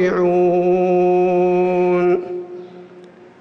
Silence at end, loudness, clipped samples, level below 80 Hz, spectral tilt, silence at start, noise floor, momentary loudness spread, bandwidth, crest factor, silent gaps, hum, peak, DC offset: 0.35 s; -16 LUFS; under 0.1%; -58 dBFS; -9 dB/octave; 0 s; -42 dBFS; 14 LU; 6.2 kHz; 8 dB; none; none; -8 dBFS; under 0.1%